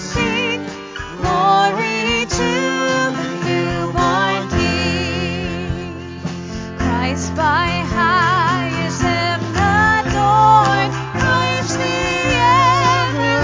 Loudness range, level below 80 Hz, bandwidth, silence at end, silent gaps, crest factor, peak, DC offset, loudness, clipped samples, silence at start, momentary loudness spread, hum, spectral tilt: 5 LU; -32 dBFS; 7.6 kHz; 0 s; none; 16 dB; 0 dBFS; under 0.1%; -16 LUFS; under 0.1%; 0 s; 11 LU; none; -4.5 dB/octave